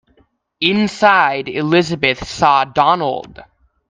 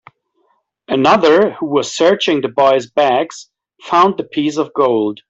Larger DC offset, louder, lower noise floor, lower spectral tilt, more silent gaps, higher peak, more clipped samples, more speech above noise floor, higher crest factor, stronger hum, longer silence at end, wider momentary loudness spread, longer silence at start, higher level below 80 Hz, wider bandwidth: neither; about the same, -15 LUFS vs -14 LUFS; second, -57 dBFS vs -62 dBFS; about the same, -5 dB/octave vs -4.5 dB/octave; neither; about the same, 0 dBFS vs -2 dBFS; neither; second, 42 dB vs 48 dB; about the same, 16 dB vs 14 dB; neither; first, 0.5 s vs 0.15 s; about the same, 7 LU vs 8 LU; second, 0.6 s vs 0.9 s; first, -48 dBFS vs -58 dBFS; first, 9.6 kHz vs 8 kHz